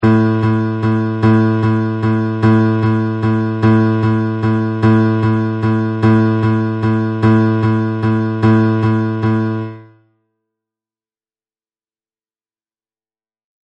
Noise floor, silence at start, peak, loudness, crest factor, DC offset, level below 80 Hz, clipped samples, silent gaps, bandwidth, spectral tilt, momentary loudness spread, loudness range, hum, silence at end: under -90 dBFS; 0 s; 0 dBFS; -14 LUFS; 14 dB; under 0.1%; -44 dBFS; under 0.1%; none; 5.6 kHz; -9.5 dB/octave; 4 LU; 6 LU; none; 3.8 s